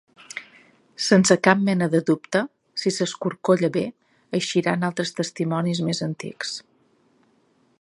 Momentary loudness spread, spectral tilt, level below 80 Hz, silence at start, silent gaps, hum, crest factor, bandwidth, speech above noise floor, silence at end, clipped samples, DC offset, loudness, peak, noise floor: 13 LU; -5 dB/octave; -68 dBFS; 0.35 s; none; none; 24 dB; 11.5 kHz; 41 dB; 1.2 s; under 0.1%; under 0.1%; -22 LUFS; 0 dBFS; -63 dBFS